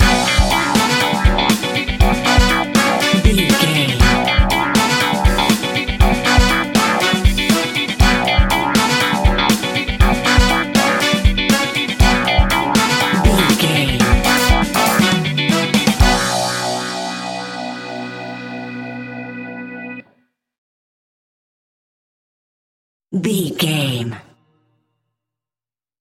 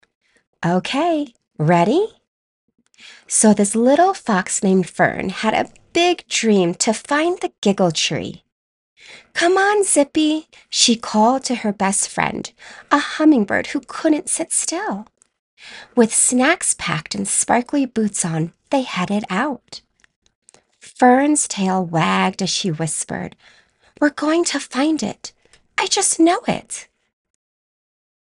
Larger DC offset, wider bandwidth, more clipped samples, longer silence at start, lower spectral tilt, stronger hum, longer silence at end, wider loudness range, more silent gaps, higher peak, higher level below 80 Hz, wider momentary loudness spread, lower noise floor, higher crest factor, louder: neither; first, 17 kHz vs 14.5 kHz; neither; second, 0 s vs 0.6 s; about the same, -4 dB/octave vs -3.5 dB/octave; neither; first, 1.8 s vs 1.45 s; first, 14 LU vs 4 LU; first, 20.58-23.00 s vs 2.28-2.68 s, 7.58-7.62 s, 8.52-8.96 s, 15.39-15.57 s, 20.16-20.22 s, 20.35-20.42 s; about the same, 0 dBFS vs 0 dBFS; first, -22 dBFS vs -58 dBFS; about the same, 14 LU vs 12 LU; first, under -90 dBFS vs -47 dBFS; about the same, 16 dB vs 18 dB; first, -14 LUFS vs -18 LUFS